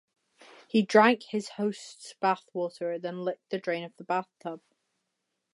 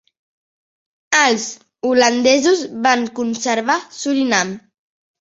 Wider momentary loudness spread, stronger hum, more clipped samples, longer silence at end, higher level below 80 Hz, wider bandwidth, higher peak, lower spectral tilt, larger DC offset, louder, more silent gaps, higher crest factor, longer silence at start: first, 19 LU vs 10 LU; neither; neither; first, 0.95 s vs 0.6 s; second, -84 dBFS vs -64 dBFS; first, 11.5 kHz vs 8 kHz; second, -6 dBFS vs 0 dBFS; first, -5 dB/octave vs -2 dB/octave; neither; second, -29 LUFS vs -16 LUFS; neither; first, 24 dB vs 18 dB; second, 0.75 s vs 1.1 s